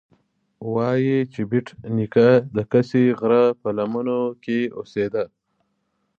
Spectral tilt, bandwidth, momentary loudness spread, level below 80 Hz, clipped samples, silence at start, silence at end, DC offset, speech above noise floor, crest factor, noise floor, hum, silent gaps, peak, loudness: -9 dB/octave; 7 kHz; 10 LU; -62 dBFS; under 0.1%; 0.6 s; 0.9 s; under 0.1%; 52 dB; 18 dB; -72 dBFS; none; none; -4 dBFS; -21 LUFS